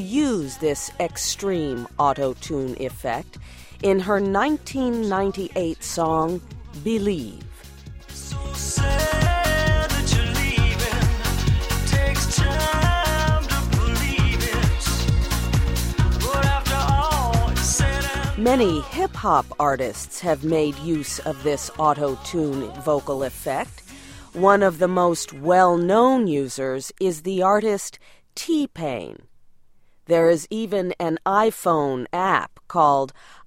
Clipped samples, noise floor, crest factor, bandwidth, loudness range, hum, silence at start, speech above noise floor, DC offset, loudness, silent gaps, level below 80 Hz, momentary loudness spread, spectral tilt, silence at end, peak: under 0.1%; -51 dBFS; 20 dB; 16.5 kHz; 5 LU; none; 0 s; 29 dB; under 0.1%; -22 LUFS; none; -30 dBFS; 10 LU; -5 dB/octave; 0.05 s; -2 dBFS